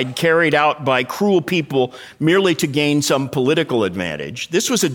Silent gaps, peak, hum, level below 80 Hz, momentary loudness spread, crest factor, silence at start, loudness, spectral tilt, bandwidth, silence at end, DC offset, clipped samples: none; -2 dBFS; none; -58 dBFS; 6 LU; 16 dB; 0 s; -17 LUFS; -4.5 dB/octave; 19.5 kHz; 0 s; under 0.1%; under 0.1%